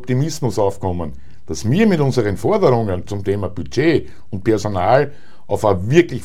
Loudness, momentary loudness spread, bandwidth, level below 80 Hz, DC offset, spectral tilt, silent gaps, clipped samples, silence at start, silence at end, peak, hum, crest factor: -18 LUFS; 10 LU; 15 kHz; -42 dBFS; 4%; -6.5 dB/octave; none; under 0.1%; 0 s; 0 s; 0 dBFS; none; 18 dB